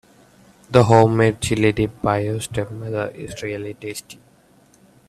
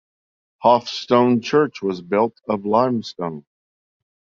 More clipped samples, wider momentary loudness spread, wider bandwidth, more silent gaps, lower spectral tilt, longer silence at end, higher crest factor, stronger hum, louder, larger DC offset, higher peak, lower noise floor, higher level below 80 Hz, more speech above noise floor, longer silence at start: neither; first, 16 LU vs 12 LU; first, 14 kHz vs 7.4 kHz; neither; about the same, -6 dB/octave vs -6 dB/octave; about the same, 0.95 s vs 0.95 s; about the same, 20 dB vs 18 dB; neither; about the same, -19 LUFS vs -20 LUFS; neither; about the same, 0 dBFS vs -2 dBFS; second, -54 dBFS vs under -90 dBFS; first, -46 dBFS vs -64 dBFS; second, 35 dB vs over 71 dB; about the same, 0.7 s vs 0.6 s